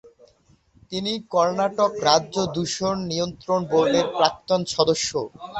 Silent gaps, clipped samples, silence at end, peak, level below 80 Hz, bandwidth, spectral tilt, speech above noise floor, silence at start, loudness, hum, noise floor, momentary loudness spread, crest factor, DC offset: none; under 0.1%; 0 s; 0 dBFS; -56 dBFS; 8.4 kHz; -4 dB/octave; 37 dB; 0.05 s; -22 LUFS; none; -59 dBFS; 7 LU; 22 dB; under 0.1%